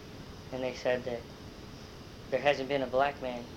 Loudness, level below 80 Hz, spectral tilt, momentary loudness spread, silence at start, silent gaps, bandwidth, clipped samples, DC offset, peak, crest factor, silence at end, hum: -32 LUFS; -56 dBFS; -5 dB/octave; 18 LU; 0 s; none; 16 kHz; under 0.1%; under 0.1%; -12 dBFS; 22 dB; 0 s; none